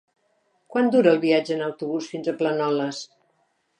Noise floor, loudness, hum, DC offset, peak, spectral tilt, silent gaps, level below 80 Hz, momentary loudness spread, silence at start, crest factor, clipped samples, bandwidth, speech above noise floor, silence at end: -69 dBFS; -23 LUFS; none; under 0.1%; -6 dBFS; -5.5 dB/octave; none; -78 dBFS; 12 LU; 0.7 s; 18 dB; under 0.1%; 10 kHz; 47 dB; 0.75 s